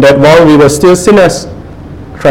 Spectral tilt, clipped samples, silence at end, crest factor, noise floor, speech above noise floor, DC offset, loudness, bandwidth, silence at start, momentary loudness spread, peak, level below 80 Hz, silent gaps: -5.5 dB/octave; 7%; 0 s; 6 dB; -25 dBFS; 21 dB; under 0.1%; -5 LUFS; 17 kHz; 0 s; 22 LU; 0 dBFS; -30 dBFS; none